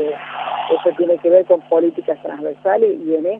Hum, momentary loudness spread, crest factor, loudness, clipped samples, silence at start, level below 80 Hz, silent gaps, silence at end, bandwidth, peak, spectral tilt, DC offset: none; 11 LU; 16 dB; -17 LUFS; under 0.1%; 0 s; -72 dBFS; none; 0 s; 3.8 kHz; 0 dBFS; -8 dB/octave; under 0.1%